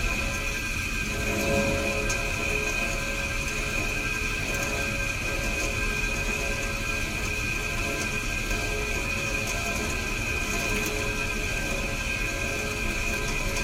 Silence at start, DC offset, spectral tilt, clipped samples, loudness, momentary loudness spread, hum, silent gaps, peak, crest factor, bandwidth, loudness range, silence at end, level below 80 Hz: 0 s; under 0.1%; -3 dB/octave; under 0.1%; -27 LUFS; 2 LU; none; none; -12 dBFS; 14 dB; 16 kHz; 1 LU; 0 s; -34 dBFS